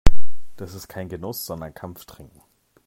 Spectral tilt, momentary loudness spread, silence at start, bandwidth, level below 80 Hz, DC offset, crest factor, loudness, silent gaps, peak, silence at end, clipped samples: -5.5 dB/octave; 16 LU; 0.05 s; 15.5 kHz; -28 dBFS; under 0.1%; 16 dB; -33 LUFS; none; 0 dBFS; 0 s; 0.4%